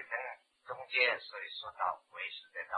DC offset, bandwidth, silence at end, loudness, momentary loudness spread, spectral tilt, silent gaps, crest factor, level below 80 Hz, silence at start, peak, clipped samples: under 0.1%; 10.5 kHz; 0 s; -36 LUFS; 17 LU; -2.5 dB/octave; none; 24 dB; -84 dBFS; 0 s; -14 dBFS; under 0.1%